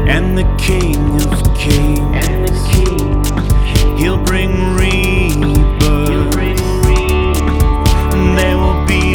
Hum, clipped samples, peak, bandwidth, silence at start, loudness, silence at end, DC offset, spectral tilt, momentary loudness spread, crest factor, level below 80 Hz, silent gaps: none; under 0.1%; 0 dBFS; 18.5 kHz; 0 s; -13 LUFS; 0 s; under 0.1%; -5.5 dB/octave; 2 LU; 10 dB; -14 dBFS; none